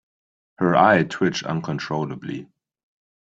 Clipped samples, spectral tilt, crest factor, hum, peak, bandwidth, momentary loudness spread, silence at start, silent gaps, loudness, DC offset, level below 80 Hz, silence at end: under 0.1%; -6 dB/octave; 20 dB; none; -2 dBFS; 7.8 kHz; 16 LU; 0.6 s; none; -21 LUFS; under 0.1%; -60 dBFS; 0.85 s